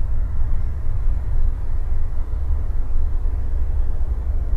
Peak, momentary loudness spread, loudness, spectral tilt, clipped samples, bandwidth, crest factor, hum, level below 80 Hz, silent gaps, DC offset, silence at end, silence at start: -8 dBFS; 2 LU; -26 LUFS; -9 dB/octave; under 0.1%; 2.1 kHz; 10 dB; none; -18 dBFS; none; under 0.1%; 0 s; 0 s